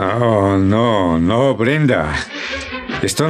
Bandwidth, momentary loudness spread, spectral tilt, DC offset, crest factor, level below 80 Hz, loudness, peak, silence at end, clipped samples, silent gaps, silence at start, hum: 15 kHz; 9 LU; -6 dB/octave; under 0.1%; 12 dB; -40 dBFS; -16 LUFS; -2 dBFS; 0 s; under 0.1%; none; 0 s; none